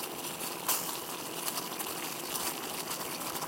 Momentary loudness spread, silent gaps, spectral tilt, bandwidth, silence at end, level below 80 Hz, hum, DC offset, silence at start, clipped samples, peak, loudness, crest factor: 5 LU; none; -1.5 dB/octave; 17 kHz; 0 s; -72 dBFS; none; under 0.1%; 0 s; under 0.1%; -14 dBFS; -34 LUFS; 22 dB